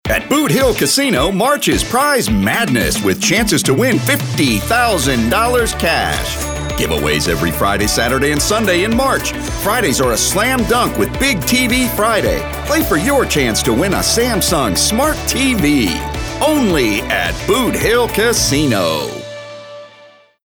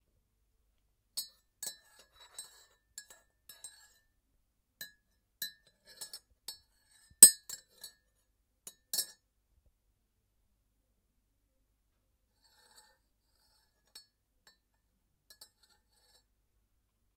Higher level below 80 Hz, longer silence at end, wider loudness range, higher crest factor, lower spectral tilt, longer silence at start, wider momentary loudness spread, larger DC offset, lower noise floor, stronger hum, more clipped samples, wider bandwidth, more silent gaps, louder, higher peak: first, -28 dBFS vs -74 dBFS; second, 0.6 s vs 8.15 s; second, 1 LU vs 23 LU; second, 12 dB vs 38 dB; first, -3.5 dB/octave vs 1.5 dB/octave; second, 0.05 s vs 1.15 s; second, 5 LU vs 33 LU; neither; second, -44 dBFS vs -78 dBFS; neither; neither; first, over 20 kHz vs 16 kHz; neither; first, -14 LUFS vs -23 LUFS; about the same, -2 dBFS vs 0 dBFS